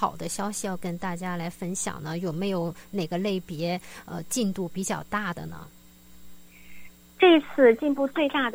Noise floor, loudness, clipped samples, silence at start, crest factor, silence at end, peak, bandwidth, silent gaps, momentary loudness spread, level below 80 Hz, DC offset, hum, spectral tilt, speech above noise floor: -50 dBFS; -26 LUFS; under 0.1%; 0 s; 22 dB; 0 s; -6 dBFS; 16.5 kHz; none; 14 LU; -58 dBFS; under 0.1%; none; -4.5 dB/octave; 24 dB